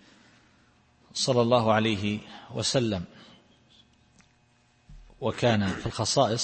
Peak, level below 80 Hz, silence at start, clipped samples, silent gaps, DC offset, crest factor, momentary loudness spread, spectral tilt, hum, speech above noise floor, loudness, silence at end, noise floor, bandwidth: -8 dBFS; -56 dBFS; 1.15 s; under 0.1%; none; under 0.1%; 20 dB; 13 LU; -4.5 dB/octave; none; 39 dB; -26 LUFS; 0 s; -64 dBFS; 8.8 kHz